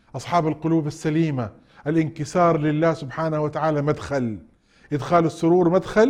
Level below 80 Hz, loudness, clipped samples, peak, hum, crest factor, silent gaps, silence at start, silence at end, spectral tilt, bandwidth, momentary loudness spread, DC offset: -52 dBFS; -22 LUFS; under 0.1%; -4 dBFS; none; 16 dB; none; 0.15 s; 0 s; -7.5 dB/octave; 11 kHz; 10 LU; under 0.1%